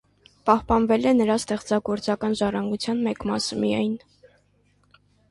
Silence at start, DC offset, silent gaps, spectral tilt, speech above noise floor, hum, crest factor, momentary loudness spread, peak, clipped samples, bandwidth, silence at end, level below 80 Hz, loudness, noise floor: 0.45 s; under 0.1%; none; -5 dB/octave; 41 dB; 50 Hz at -50 dBFS; 20 dB; 6 LU; -4 dBFS; under 0.1%; 11.5 kHz; 1.35 s; -48 dBFS; -23 LUFS; -63 dBFS